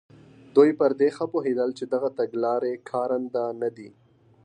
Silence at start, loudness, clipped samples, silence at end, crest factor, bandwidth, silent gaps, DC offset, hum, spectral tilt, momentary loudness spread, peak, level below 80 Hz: 0.55 s; -25 LUFS; under 0.1%; 0.55 s; 20 dB; 9.6 kHz; none; under 0.1%; none; -7 dB/octave; 9 LU; -4 dBFS; -76 dBFS